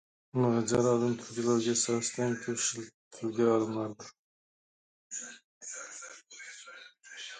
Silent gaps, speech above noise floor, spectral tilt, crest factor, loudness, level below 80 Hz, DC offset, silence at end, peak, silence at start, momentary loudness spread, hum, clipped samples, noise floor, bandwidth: 2.94-3.11 s, 4.19-5.10 s, 5.44-5.61 s; 22 dB; -4.5 dB/octave; 18 dB; -31 LUFS; -70 dBFS; under 0.1%; 0 s; -14 dBFS; 0.35 s; 19 LU; none; under 0.1%; -52 dBFS; 9.6 kHz